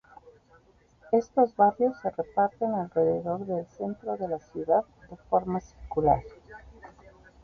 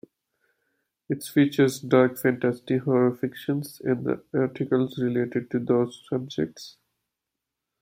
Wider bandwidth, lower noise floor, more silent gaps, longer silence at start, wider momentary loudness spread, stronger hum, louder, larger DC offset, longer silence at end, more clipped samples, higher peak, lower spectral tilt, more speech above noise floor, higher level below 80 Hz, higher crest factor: second, 6.6 kHz vs 16.5 kHz; second, -60 dBFS vs -85 dBFS; neither; second, 0.25 s vs 1.1 s; about the same, 12 LU vs 10 LU; neither; second, -28 LUFS vs -25 LUFS; neither; second, 0.55 s vs 1.1 s; neither; second, -10 dBFS vs -6 dBFS; first, -9 dB/octave vs -6.5 dB/octave; second, 33 dB vs 61 dB; first, -54 dBFS vs -68 dBFS; about the same, 20 dB vs 20 dB